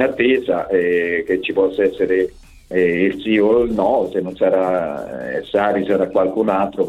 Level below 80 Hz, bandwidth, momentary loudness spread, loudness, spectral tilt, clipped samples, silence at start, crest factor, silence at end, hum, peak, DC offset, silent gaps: -48 dBFS; 10 kHz; 7 LU; -18 LUFS; -7 dB/octave; under 0.1%; 0 s; 16 dB; 0 s; none; -2 dBFS; under 0.1%; none